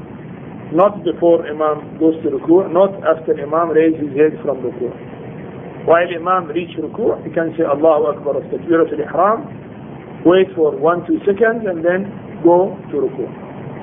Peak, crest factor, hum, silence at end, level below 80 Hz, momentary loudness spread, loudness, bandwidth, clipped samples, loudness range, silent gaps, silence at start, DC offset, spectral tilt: 0 dBFS; 16 dB; none; 0 s; -54 dBFS; 18 LU; -16 LUFS; 3.7 kHz; under 0.1%; 3 LU; none; 0 s; under 0.1%; -10.5 dB/octave